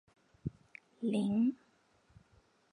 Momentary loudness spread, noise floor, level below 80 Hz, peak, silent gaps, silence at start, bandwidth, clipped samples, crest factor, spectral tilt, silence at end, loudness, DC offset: 24 LU; -70 dBFS; -68 dBFS; -22 dBFS; none; 0.45 s; 11 kHz; under 0.1%; 16 dB; -8 dB/octave; 1.2 s; -36 LUFS; under 0.1%